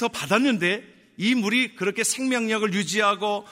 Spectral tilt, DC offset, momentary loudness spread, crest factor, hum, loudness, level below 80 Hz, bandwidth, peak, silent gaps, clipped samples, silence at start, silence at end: -3.5 dB/octave; under 0.1%; 4 LU; 16 dB; none; -23 LUFS; -70 dBFS; 16 kHz; -6 dBFS; none; under 0.1%; 0 s; 0 s